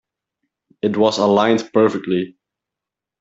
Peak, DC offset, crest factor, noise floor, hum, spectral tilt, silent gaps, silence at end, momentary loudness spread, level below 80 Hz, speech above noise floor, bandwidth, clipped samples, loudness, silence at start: -2 dBFS; under 0.1%; 16 dB; -86 dBFS; none; -5.5 dB/octave; none; 0.9 s; 9 LU; -62 dBFS; 69 dB; 8 kHz; under 0.1%; -17 LUFS; 0.85 s